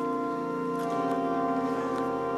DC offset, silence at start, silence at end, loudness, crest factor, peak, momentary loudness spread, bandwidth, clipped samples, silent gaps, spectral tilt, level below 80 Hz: under 0.1%; 0 s; 0 s; -30 LUFS; 12 dB; -16 dBFS; 3 LU; 14 kHz; under 0.1%; none; -7 dB/octave; -62 dBFS